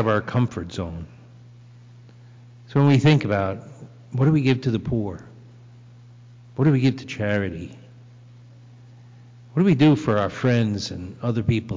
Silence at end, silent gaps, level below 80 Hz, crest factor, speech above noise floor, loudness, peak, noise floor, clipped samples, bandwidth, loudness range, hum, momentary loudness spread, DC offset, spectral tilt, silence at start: 0 s; none; -48 dBFS; 14 dB; 26 dB; -22 LUFS; -10 dBFS; -46 dBFS; under 0.1%; 7.6 kHz; 5 LU; 60 Hz at -50 dBFS; 18 LU; under 0.1%; -7.5 dB/octave; 0 s